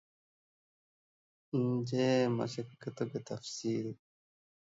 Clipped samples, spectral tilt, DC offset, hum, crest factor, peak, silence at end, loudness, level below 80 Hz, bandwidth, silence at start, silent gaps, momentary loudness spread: under 0.1%; -6 dB/octave; under 0.1%; none; 18 dB; -20 dBFS; 0.75 s; -35 LUFS; -78 dBFS; 8 kHz; 1.55 s; none; 13 LU